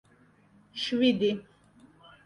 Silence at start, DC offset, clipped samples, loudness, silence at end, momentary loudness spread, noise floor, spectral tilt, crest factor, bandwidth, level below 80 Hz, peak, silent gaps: 0.75 s; under 0.1%; under 0.1%; -28 LUFS; 0.85 s; 14 LU; -61 dBFS; -5.5 dB/octave; 20 dB; 10.5 kHz; -68 dBFS; -12 dBFS; none